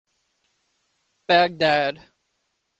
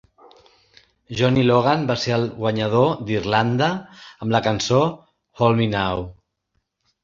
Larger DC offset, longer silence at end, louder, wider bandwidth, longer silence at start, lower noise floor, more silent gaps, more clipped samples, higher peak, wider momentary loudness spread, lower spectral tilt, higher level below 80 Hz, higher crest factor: neither; about the same, 0.85 s vs 0.9 s; about the same, -20 LUFS vs -20 LUFS; about the same, 8.2 kHz vs 7.6 kHz; first, 1.3 s vs 1.1 s; about the same, -74 dBFS vs -73 dBFS; neither; neither; about the same, -4 dBFS vs -2 dBFS; first, 23 LU vs 8 LU; about the same, -5 dB/octave vs -6 dB/octave; second, -66 dBFS vs -48 dBFS; about the same, 22 dB vs 18 dB